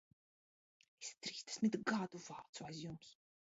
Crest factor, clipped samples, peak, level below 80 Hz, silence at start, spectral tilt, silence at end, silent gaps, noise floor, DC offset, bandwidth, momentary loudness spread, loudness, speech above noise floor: 20 dB; under 0.1%; -24 dBFS; -82 dBFS; 1 s; -4 dB/octave; 0.3 s; 2.49-2.53 s; under -90 dBFS; under 0.1%; 7.6 kHz; 14 LU; -44 LUFS; over 46 dB